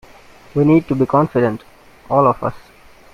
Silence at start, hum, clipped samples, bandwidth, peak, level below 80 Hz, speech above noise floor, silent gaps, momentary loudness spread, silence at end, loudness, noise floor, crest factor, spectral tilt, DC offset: 0.55 s; none; under 0.1%; 11 kHz; 0 dBFS; -48 dBFS; 28 dB; none; 11 LU; 0.55 s; -16 LUFS; -43 dBFS; 16 dB; -9.5 dB/octave; under 0.1%